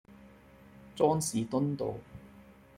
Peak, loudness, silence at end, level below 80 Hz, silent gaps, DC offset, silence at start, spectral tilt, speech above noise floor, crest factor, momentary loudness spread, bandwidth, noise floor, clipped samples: -12 dBFS; -31 LUFS; 0.35 s; -64 dBFS; none; under 0.1%; 0.1 s; -6 dB/octave; 26 dB; 22 dB; 23 LU; 16 kHz; -56 dBFS; under 0.1%